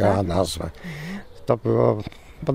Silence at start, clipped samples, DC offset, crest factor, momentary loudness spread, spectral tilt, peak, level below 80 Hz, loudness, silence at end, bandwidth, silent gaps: 0 s; under 0.1%; under 0.1%; 18 dB; 14 LU; -6.5 dB/octave; -6 dBFS; -44 dBFS; -24 LUFS; 0 s; 16 kHz; none